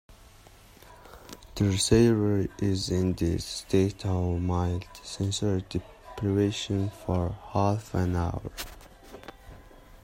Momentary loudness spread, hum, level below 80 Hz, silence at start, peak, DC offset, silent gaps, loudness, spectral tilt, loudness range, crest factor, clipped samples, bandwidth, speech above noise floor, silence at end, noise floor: 21 LU; none; -48 dBFS; 0.1 s; -8 dBFS; under 0.1%; none; -28 LUFS; -6 dB/octave; 4 LU; 22 dB; under 0.1%; 16 kHz; 26 dB; 0.1 s; -53 dBFS